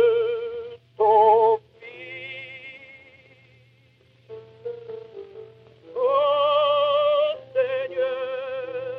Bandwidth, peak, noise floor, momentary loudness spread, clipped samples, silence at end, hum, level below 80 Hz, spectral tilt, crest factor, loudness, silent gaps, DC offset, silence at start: 5.2 kHz; -6 dBFS; -58 dBFS; 23 LU; under 0.1%; 0 s; none; -74 dBFS; -5.5 dB/octave; 18 dB; -22 LUFS; none; under 0.1%; 0 s